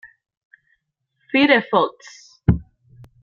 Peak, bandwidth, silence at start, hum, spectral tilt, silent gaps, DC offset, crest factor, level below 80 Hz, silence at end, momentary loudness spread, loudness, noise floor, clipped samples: -2 dBFS; 7.4 kHz; 1.35 s; none; -7 dB/octave; none; under 0.1%; 20 dB; -40 dBFS; 0.6 s; 9 LU; -19 LUFS; -71 dBFS; under 0.1%